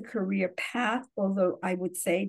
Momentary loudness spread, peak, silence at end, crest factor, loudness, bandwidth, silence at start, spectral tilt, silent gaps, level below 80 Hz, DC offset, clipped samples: 4 LU; -14 dBFS; 0 s; 16 dB; -30 LUFS; 12.5 kHz; 0 s; -5 dB/octave; none; -80 dBFS; under 0.1%; under 0.1%